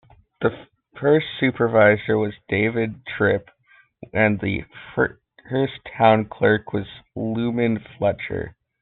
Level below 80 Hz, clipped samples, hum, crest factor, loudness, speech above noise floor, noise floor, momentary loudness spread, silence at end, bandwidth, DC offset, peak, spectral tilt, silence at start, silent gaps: -54 dBFS; under 0.1%; none; 20 dB; -22 LUFS; 36 dB; -57 dBFS; 12 LU; 0.3 s; 4.3 kHz; under 0.1%; -2 dBFS; -5 dB/octave; 0.4 s; none